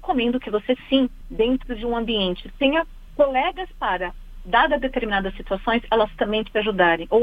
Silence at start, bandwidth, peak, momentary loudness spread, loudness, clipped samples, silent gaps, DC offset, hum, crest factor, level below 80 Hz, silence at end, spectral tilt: 0 s; 5 kHz; -2 dBFS; 8 LU; -22 LUFS; under 0.1%; none; under 0.1%; none; 20 dB; -38 dBFS; 0 s; -7 dB/octave